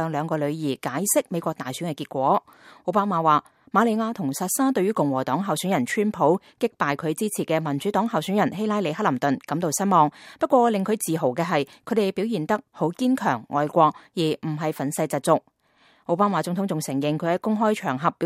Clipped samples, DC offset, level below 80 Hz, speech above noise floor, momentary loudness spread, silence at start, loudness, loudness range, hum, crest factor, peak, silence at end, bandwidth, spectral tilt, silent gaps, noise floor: under 0.1%; under 0.1%; -70 dBFS; 37 dB; 7 LU; 0 s; -24 LUFS; 2 LU; none; 20 dB; -4 dBFS; 0 s; 16 kHz; -5 dB/octave; none; -60 dBFS